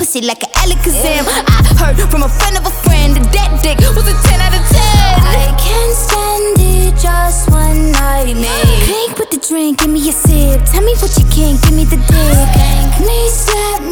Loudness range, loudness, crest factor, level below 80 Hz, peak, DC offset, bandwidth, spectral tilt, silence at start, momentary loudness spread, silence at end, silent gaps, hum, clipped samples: 1 LU; -11 LUFS; 8 dB; -10 dBFS; 0 dBFS; under 0.1%; over 20 kHz; -4.5 dB/octave; 0 s; 4 LU; 0 s; none; none; under 0.1%